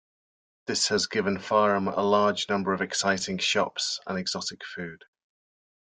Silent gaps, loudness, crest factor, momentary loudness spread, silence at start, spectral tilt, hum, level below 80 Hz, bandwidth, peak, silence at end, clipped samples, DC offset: none; -26 LUFS; 20 dB; 13 LU; 0.7 s; -3 dB/octave; none; -68 dBFS; 9.6 kHz; -8 dBFS; 0.95 s; under 0.1%; under 0.1%